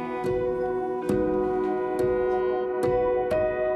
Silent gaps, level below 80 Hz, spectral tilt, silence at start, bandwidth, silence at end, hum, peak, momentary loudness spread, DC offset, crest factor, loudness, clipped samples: none; -48 dBFS; -7.5 dB/octave; 0 s; 12.5 kHz; 0 s; none; -14 dBFS; 3 LU; under 0.1%; 12 dB; -26 LUFS; under 0.1%